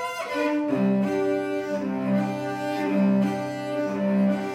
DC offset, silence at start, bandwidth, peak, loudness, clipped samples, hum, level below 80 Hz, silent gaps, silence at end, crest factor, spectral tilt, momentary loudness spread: under 0.1%; 0 s; 14 kHz; -12 dBFS; -25 LUFS; under 0.1%; none; -72 dBFS; none; 0 s; 14 dB; -7.5 dB/octave; 6 LU